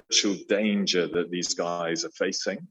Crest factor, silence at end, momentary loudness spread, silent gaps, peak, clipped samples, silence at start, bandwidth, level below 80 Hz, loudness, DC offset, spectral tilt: 18 dB; 0.05 s; 5 LU; none; -8 dBFS; under 0.1%; 0.1 s; 8.6 kHz; -70 dBFS; -26 LUFS; under 0.1%; -3 dB/octave